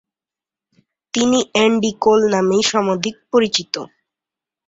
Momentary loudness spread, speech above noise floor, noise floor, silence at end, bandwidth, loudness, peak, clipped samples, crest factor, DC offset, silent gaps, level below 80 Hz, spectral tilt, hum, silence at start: 10 LU; 73 dB; -89 dBFS; 0.8 s; 8 kHz; -17 LUFS; 0 dBFS; under 0.1%; 18 dB; under 0.1%; none; -58 dBFS; -3.5 dB/octave; none; 1.15 s